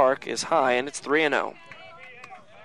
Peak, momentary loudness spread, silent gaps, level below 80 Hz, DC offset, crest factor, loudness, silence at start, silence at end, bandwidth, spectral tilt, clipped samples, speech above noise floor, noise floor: -6 dBFS; 22 LU; none; -70 dBFS; 0.2%; 20 dB; -24 LUFS; 0 s; 0.25 s; 12 kHz; -3 dB/octave; under 0.1%; 21 dB; -46 dBFS